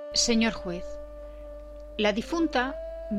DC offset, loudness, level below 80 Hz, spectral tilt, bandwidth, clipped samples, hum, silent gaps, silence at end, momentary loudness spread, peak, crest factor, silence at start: under 0.1%; -27 LUFS; -44 dBFS; -3 dB/octave; 13 kHz; under 0.1%; none; none; 0 s; 20 LU; -12 dBFS; 18 dB; 0 s